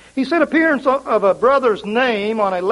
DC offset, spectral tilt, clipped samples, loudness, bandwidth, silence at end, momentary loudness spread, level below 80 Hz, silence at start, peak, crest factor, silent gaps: under 0.1%; -5.5 dB/octave; under 0.1%; -16 LUFS; 11.5 kHz; 0 s; 4 LU; -54 dBFS; 0.15 s; -2 dBFS; 14 dB; none